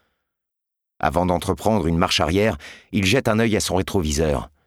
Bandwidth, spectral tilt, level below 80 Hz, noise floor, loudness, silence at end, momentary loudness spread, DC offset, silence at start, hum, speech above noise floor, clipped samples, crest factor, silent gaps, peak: 16.5 kHz; -5 dB/octave; -36 dBFS; -83 dBFS; -20 LUFS; 0.2 s; 5 LU; under 0.1%; 1 s; none; 62 dB; under 0.1%; 20 dB; none; -2 dBFS